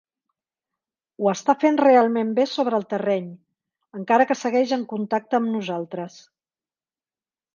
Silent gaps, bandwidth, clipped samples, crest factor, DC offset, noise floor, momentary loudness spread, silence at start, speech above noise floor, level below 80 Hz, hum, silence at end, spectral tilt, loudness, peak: none; 7.4 kHz; under 0.1%; 20 dB; under 0.1%; under -90 dBFS; 16 LU; 1.2 s; over 69 dB; -74 dBFS; none; 1.45 s; -5.5 dB/octave; -21 LUFS; -4 dBFS